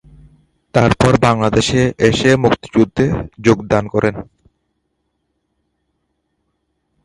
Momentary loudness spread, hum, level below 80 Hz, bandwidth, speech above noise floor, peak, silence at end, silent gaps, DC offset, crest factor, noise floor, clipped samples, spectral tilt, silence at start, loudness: 6 LU; none; -38 dBFS; 11.5 kHz; 56 dB; 0 dBFS; 2.8 s; none; under 0.1%; 16 dB; -69 dBFS; under 0.1%; -6 dB/octave; 0.75 s; -14 LUFS